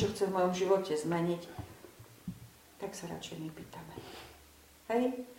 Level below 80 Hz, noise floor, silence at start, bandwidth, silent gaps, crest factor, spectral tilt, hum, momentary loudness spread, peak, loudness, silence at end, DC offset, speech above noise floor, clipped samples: -64 dBFS; -59 dBFS; 0 s; 16.5 kHz; none; 20 dB; -5.5 dB/octave; none; 22 LU; -16 dBFS; -34 LUFS; 0 s; under 0.1%; 25 dB; under 0.1%